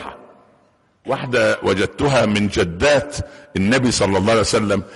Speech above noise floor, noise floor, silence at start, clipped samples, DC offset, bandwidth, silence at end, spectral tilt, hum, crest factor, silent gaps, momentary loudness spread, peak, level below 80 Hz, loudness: 40 dB; -58 dBFS; 0 s; under 0.1%; under 0.1%; 11.5 kHz; 0 s; -4.5 dB/octave; none; 12 dB; none; 12 LU; -6 dBFS; -40 dBFS; -18 LUFS